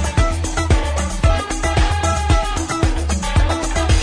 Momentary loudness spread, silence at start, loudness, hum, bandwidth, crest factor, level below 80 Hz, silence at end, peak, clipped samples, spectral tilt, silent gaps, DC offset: 3 LU; 0 s; -19 LUFS; none; 10.5 kHz; 14 dB; -20 dBFS; 0 s; -2 dBFS; under 0.1%; -4.5 dB/octave; none; under 0.1%